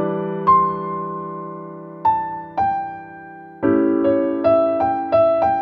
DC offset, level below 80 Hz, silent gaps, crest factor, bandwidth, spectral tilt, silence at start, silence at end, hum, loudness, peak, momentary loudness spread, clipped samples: under 0.1%; -52 dBFS; none; 14 dB; 5.6 kHz; -9.5 dB/octave; 0 s; 0 s; none; -19 LUFS; -4 dBFS; 18 LU; under 0.1%